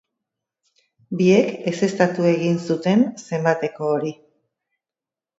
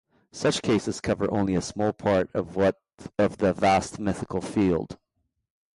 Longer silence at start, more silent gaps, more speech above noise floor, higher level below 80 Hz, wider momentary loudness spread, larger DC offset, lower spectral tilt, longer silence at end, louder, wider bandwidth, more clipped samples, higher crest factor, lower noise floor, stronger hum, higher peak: first, 1.1 s vs 0.35 s; neither; first, 70 dB vs 52 dB; second, -68 dBFS vs -50 dBFS; about the same, 7 LU vs 7 LU; neither; about the same, -6.5 dB/octave vs -5.5 dB/octave; first, 1.25 s vs 0.8 s; first, -20 LUFS vs -26 LUFS; second, 8 kHz vs 11.5 kHz; neither; first, 20 dB vs 14 dB; first, -90 dBFS vs -77 dBFS; neither; first, -2 dBFS vs -12 dBFS